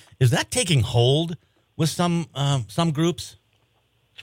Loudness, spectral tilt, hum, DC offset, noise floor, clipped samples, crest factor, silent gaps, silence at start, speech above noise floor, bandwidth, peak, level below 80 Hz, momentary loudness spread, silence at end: -22 LUFS; -5 dB/octave; none; under 0.1%; -66 dBFS; under 0.1%; 18 dB; none; 0.2 s; 44 dB; 16.5 kHz; -6 dBFS; -52 dBFS; 11 LU; 0 s